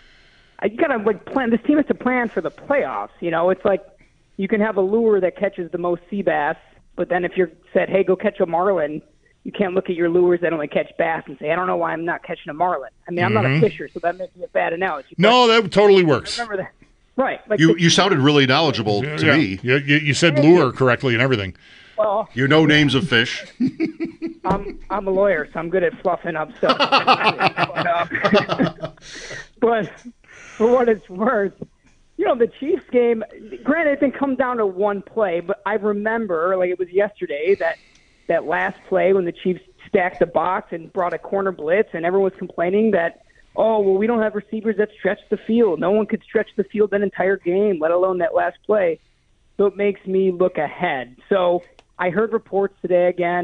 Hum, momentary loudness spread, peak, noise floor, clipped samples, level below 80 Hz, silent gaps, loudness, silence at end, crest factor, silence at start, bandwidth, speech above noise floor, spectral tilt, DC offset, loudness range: none; 11 LU; -2 dBFS; -58 dBFS; under 0.1%; -52 dBFS; none; -19 LUFS; 0 s; 16 dB; 0.6 s; 10 kHz; 39 dB; -5.5 dB/octave; under 0.1%; 5 LU